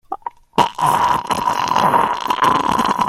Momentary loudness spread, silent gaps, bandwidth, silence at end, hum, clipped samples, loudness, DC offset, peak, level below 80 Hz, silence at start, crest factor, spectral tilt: 5 LU; none; 16 kHz; 0 s; none; under 0.1%; -16 LUFS; under 0.1%; 0 dBFS; -48 dBFS; 0.1 s; 16 dB; -4 dB/octave